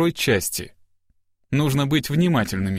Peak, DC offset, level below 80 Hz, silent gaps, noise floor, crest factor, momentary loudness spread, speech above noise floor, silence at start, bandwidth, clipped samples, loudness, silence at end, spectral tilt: -6 dBFS; under 0.1%; -48 dBFS; none; -64 dBFS; 16 dB; 8 LU; 44 dB; 0 s; 16 kHz; under 0.1%; -21 LUFS; 0 s; -5 dB/octave